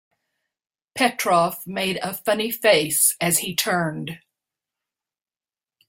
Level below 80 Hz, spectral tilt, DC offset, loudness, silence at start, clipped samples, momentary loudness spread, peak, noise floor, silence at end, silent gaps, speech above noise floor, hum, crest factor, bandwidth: -66 dBFS; -2.5 dB/octave; under 0.1%; -20 LUFS; 0.95 s; under 0.1%; 13 LU; -4 dBFS; under -90 dBFS; 1.7 s; none; over 68 dB; none; 20 dB; 16.5 kHz